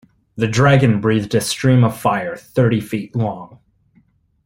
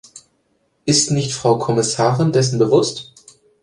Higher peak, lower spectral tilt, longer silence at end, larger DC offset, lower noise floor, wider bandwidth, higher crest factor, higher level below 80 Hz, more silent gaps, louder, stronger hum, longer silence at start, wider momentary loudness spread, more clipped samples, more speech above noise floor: about the same, -2 dBFS vs -2 dBFS; first, -6 dB/octave vs -4.5 dB/octave; first, 1 s vs 0.6 s; neither; second, -57 dBFS vs -64 dBFS; first, 16.5 kHz vs 11.5 kHz; about the same, 16 dB vs 16 dB; about the same, -50 dBFS vs -54 dBFS; neither; about the same, -17 LUFS vs -17 LUFS; neither; first, 0.35 s vs 0.15 s; first, 11 LU vs 6 LU; neither; second, 41 dB vs 48 dB